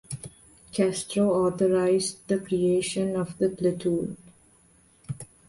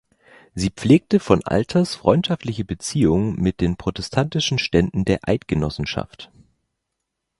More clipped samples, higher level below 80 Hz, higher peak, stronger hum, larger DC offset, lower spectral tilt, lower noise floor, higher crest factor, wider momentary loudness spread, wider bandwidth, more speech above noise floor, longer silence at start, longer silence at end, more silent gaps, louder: neither; second, -60 dBFS vs -40 dBFS; second, -10 dBFS vs 0 dBFS; neither; neither; about the same, -5.5 dB/octave vs -6 dB/octave; second, -60 dBFS vs -79 dBFS; about the same, 16 dB vs 20 dB; first, 16 LU vs 9 LU; about the same, 11.5 kHz vs 11.5 kHz; second, 35 dB vs 59 dB; second, 0.1 s vs 0.55 s; second, 0.25 s vs 1.15 s; neither; second, -26 LUFS vs -20 LUFS